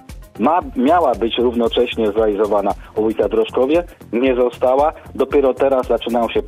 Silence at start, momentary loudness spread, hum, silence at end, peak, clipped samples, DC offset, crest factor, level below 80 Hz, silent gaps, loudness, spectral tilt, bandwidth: 0.1 s; 5 LU; none; 0 s; -4 dBFS; under 0.1%; under 0.1%; 12 dB; -40 dBFS; none; -17 LUFS; -6 dB/octave; 15 kHz